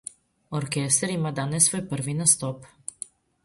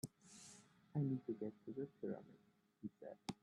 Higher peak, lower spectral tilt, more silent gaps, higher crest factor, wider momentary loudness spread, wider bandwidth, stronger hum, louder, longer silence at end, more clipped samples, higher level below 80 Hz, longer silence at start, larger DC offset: first, -2 dBFS vs -30 dBFS; second, -3.5 dB/octave vs -7 dB/octave; neither; about the same, 24 dB vs 20 dB; about the same, 19 LU vs 17 LU; about the same, 12 kHz vs 12.5 kHz; neither; first, -23 LUFS vs -48 LUFS; first, 0.8 s vs 0.1 s; neither; first, -62 dBFS vs -84 dBFS; first, 0.5 s vs 0.05 s; neither